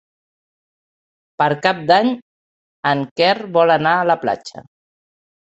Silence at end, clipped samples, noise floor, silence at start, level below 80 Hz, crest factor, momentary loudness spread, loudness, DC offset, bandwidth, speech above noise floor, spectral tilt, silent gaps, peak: 0.95 s; under 0.1%; under -90 dBFS; 1.4 s; -64 dBFS; 20 dB; 9 LU; -17 LUFS; under 0.1%; 8.2 kHz; over 74 dB; -5.5 dB/octave; 2.22-2.83 s, 3.11-3.16 s; 0 dBFS